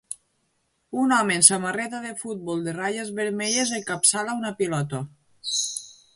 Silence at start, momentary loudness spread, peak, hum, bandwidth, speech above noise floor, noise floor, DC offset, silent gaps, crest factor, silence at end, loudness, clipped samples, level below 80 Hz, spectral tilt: 0.1 s; 18 LU; 0 dBFS; none; 12 kHz; 47 dB; -71 dBFS; under 0.1%; none; 26 dB; 0.25 s; -23 LUFS; under 0.1%; -68 dBFS; -2.5 dB/octave